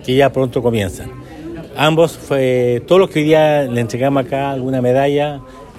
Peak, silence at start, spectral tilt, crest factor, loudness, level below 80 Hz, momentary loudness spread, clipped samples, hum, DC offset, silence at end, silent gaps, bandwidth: 0 dBFS; 0 s; -6.5 dB/octave; 14 dB; -15 LUFS; -44 dBFS; 18 LU; under 0.1%; none; under 0.1%; 0 s; none; 14 kHz